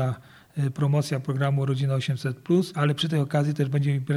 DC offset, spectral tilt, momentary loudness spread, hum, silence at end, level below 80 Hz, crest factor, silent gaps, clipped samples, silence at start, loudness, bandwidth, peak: under 0.1%; -7 dB/octave; 6 LU; none; 0 s; -66 dBFS; 16 dB; none; under 0.1%; 0 s; -25 LUFS; 12 kHz; -10 dBFS